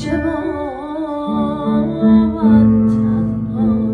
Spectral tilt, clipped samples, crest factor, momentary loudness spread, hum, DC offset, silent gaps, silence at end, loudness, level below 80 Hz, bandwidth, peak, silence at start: -9 dB/octave; under 0.1%; 12 dB; 11 LU; none; under 0.1%; none; 0 s; -16 LUFS; -36 dBFS; 4.5 kHz; -2 dBFS; 0 s